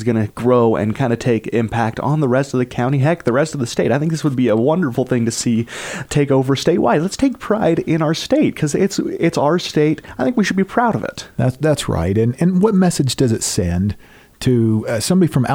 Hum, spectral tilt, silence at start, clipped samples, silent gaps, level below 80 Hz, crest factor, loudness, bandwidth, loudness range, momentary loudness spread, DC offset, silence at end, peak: none; -6 dB/octave; 0 s; under 0.1%; none; -42 dBFS; 14 dB; -17 LUFS; 17 kHz; 1 LU; 5 LU; under 0.1%; 0 s; -2 dBFS